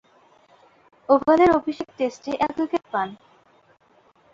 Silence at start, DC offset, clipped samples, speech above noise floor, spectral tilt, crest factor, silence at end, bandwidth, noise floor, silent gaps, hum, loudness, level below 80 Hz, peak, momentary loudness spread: 1.1 s; under 0.1%; under 0.1%; 38 dB; -6 dB/octave; 20 dB; 1.2 s; 7.6 kHz; -59 dBFS; none; none; -22 LUFS; -56 dBFS; -4 dBFS; 13 LU